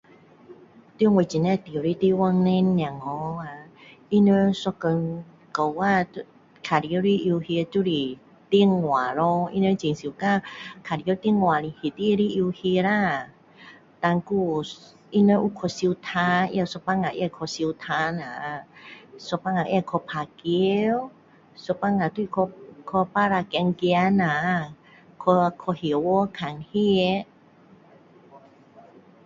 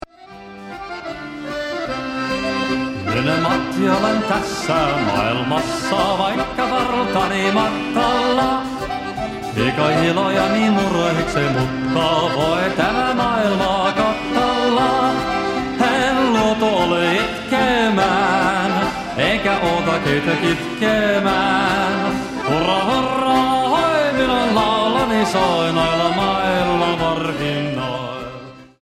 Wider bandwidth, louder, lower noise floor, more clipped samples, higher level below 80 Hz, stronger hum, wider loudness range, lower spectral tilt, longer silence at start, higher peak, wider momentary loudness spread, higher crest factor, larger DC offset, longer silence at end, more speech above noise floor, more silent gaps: second, 7.6 kHz vs 16 kHz; second, -24 LUFS vs -18 LUFS; first, -53 dBFS vs -39 dBFS; neither; second, -60 dBFS vs -42 dBFS; neither; about the same, 4 LU vs 2 LU; first, -7 dB/octave vs -5 dB/octave; first, 0.5 s vs 0.2 s; second, -6 dBFS vs -2 dBFS; first, 12 LU vs 8 LU; about the same, 18 dB vs 16 dB; neither; first, 0.85 s vs 0.15 s; first, 30 dB vs 21 dB; neither